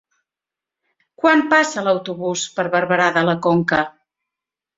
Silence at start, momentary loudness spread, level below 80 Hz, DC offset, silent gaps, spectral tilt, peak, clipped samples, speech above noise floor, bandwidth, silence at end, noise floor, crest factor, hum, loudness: 1.25 s; 8 LU; -60 dBFS; under 0.1%; none; -4.5 dB/octave; 0 dBFS; under 0.1%; 70 dB; 7.8 kHz; 0.9 s; -88 dBFS; 20 dB; none; -18 LUFS